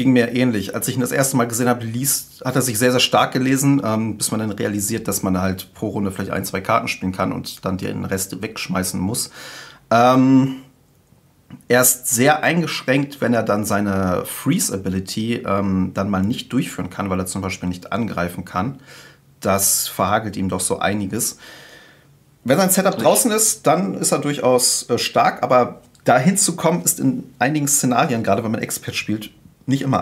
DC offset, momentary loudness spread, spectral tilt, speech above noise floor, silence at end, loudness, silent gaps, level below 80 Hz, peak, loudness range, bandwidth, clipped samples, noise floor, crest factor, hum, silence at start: under 0.1%; 10 LU; -4 dB/octave; 35 dB; 0 s; -19 LUFS; none; -56 dBFS; 0 dBFS; 6 LU; 16 kHz; under 0.1%; -54 dBFS; 18 dB; none; 0 s